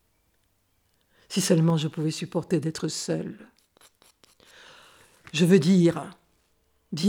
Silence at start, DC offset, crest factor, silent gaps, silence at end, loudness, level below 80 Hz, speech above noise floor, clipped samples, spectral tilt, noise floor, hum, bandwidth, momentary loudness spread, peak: 1.3 s; under 0.1%; 20 dB; none; 0 s; -24 LUFS; -68 dBFS; 46 dB; under 0.1%; -6 dB/octave; -70 dBFS; none; 17 kHz; 17 LU; -6 dBFS